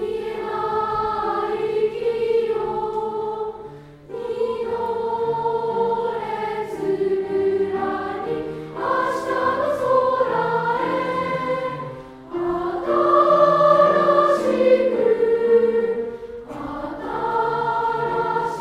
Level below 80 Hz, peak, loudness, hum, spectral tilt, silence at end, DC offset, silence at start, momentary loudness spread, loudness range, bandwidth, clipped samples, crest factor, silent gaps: -54 dBFS; -4 dBFS; -21 LUFS; none; -6.5 dB/octave; 0 s; under 0.1%; 0 s; 13 LU; 8 LU; 11.5 kHz; under 0.1%; 18 dB; none